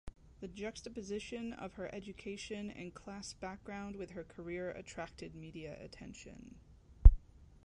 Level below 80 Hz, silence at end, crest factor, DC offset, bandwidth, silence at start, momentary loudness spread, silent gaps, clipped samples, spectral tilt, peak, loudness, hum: -36 dBFS; 0.5 s; 28 dB; under 0.1%; 8.8 kHz; 0.05 s; 16 LU; none; under 0.1%; -6 dB/octave; -8 dBFS; -40 LUFS; none